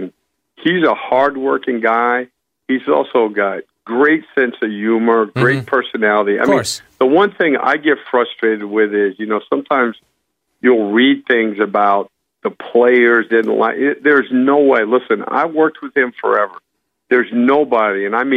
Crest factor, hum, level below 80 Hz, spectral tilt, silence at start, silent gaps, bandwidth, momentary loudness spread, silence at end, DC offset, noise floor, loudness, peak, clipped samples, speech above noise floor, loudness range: 14 dB; none; -64 dBFS; -5.5 dB/octave; 0 s; none; 13 kHz; 8 LU; 0 s; under 0.1%; -69 dBFS; -15 LUFS; -2 dBFS; under 0.1%; 55 dB; 3 LU